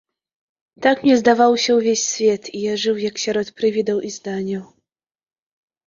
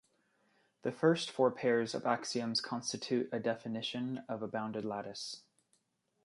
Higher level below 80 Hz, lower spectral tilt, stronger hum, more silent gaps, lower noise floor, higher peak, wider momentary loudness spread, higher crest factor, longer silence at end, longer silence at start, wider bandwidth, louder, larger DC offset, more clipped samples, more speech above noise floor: first, -62 dBFS vs -80 dBFS; about the same, -3.5 dB/octave vs -4.5 dB/octave; neither; neither; first, under -90 dBFS vs -79 dBFS; first, -2 dBFS vs -16 dBFS; about the same, 11 LU vs 11 LU; about the same, 18 dB vs 20 dB; first, 1.2 s vs 0.85 s; about the same, 0.8 s vs 0.85 s; second, 7.6 kHz vs 11.5 kHz; first, -18 LUFS vs -36 LUFS; neither; neither; first, over 72 dB vs 44 dB